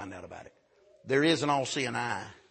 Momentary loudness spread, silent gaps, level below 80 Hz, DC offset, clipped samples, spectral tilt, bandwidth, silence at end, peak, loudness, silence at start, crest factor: 20 LU; none; -70 dBFS; under 0.1%; under 0.1%; -4 dB/octave; 8.8 kHz; 0.15 s; -12 dBFS; -29 LUFS; 0 s; 20 dB